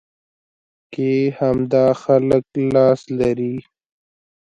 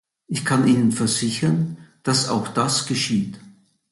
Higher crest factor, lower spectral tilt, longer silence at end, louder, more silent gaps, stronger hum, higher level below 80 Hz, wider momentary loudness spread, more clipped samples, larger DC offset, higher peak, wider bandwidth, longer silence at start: about the same, 18 dB vs 16 dB; first, -8.5 dB/octave vs -4.5 dB/octave; first, 0.8 s vs 0.4 s; first, -18 LUFS vs -21 LUFS; neither; neither; first, -52 dBFS vs -58 dBFS; about the same, 9 LU vs 11 LU; neither; neither; first, -2 dBFS vs -6 dBFS; second, 8 kHz vs 12 kHz; first, 0.9 s vs 0.3 s